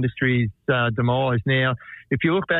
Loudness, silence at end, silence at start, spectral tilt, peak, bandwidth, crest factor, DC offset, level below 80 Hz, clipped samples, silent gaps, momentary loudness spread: -22 LUFS; 0 s; 0 s; -10 dB/octave; -8 dBFS; 4.1 kHz; 14 dB; under 0.1%; -52 dBFS; under 0.1%; none; 4 LU